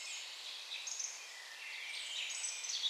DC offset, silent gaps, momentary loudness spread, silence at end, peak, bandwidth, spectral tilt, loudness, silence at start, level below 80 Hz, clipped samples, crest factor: under 0.1%; none; 8 LU; 0 s; -26 dBFS; 15.5 kHz; 7.5 dB/octave; -42 LUFS; 0 s; under -90 dBFS; under 0.1%; 18 dB